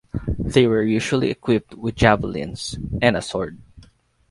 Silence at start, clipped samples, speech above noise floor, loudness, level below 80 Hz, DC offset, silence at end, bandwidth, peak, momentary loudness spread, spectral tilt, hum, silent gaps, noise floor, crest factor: 0.15 s; under 0.1%; 33 dB; -21 LUFS; -38 dBFS; under 0.1%; 0.5 s; 11.5 kHz; 0 dBFS; 11 LU; -6 dB/octave; none; none; -53 dBFS; 20 dB